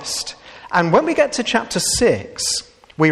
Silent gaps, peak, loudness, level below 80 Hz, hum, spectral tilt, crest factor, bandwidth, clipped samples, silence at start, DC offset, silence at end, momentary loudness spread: none; -2 dBFS; -18 LUFS; -46 dBFS; none; -3.5 dB/octave; 18 dB; 14 kHz; under 0.1%; 0 s; under 0.1%; 0 s; 9 LU